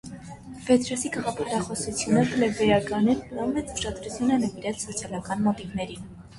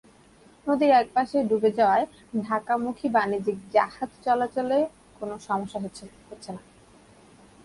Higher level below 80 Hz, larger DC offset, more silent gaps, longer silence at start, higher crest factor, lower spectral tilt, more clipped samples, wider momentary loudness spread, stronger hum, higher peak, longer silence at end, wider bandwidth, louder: first, -50 dBFS vs -62 dBFS; neither; neither; second, 0.05 s vs 0.65 s; about the same, 18 dB vs 18 dB; about the same, -5 dB/octave vs -6 dB/octave; neither; second, 11 LU vs 19 LU; neither; about the same, -8 dBFS vs -8 dBFS; second, 0 s vs 1.05 s; about the same, 11.5 kHz vs 11.5 kHz; about the same, -26 LUFS vs -25 LUFS